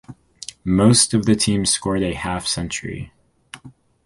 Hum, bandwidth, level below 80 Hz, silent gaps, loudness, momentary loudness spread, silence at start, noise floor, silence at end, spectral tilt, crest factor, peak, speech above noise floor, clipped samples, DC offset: none; 11.5 kHz; -42 dBFS; none; -18 LUFS; 20 LU; 0.1 s; -46 dBFS; 0.35 s; -4 dB/octave; 20 dB; -2 dBFS; 27 dB; under 0.1%; under 0.1%